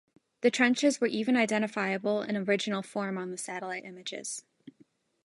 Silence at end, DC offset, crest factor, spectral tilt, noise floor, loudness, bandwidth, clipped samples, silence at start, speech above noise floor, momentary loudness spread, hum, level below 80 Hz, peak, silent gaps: 0.55 s; under 0.1%; 20 dB; -4 dB/octave; -65 dBFS; -30 LUFS; 11.5 kHz; under 0.1%; 0.4 s; 35 dB; 13 LU; none; -80 dBFS; -10 dBFS; none